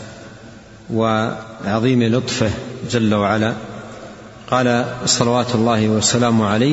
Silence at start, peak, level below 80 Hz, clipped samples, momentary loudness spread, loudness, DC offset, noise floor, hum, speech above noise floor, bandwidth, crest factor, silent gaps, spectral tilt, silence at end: 0 s; 0 dBFS; -48 dBFS; under 0.1%; 19 LU; -17 LUFS; under 0.1%; -40 dBFS; none; 23 dB; 8 kHz; 18 dB; none; -4.5 dB/octave; 0 s